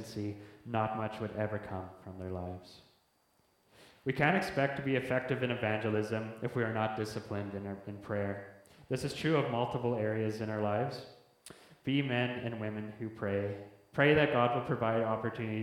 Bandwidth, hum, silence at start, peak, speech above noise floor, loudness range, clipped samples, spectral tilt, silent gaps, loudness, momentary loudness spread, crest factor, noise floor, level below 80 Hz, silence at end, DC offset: 16 kHz; none; 0 s; -12 dBFS; 38 dB; 7 LU; under 0.1%; -6.5 dB/octave; none; -34 LUFS; 14 LU; 22 dB; -72 dBFS; -66 dBFS; 0 s; under 0.1%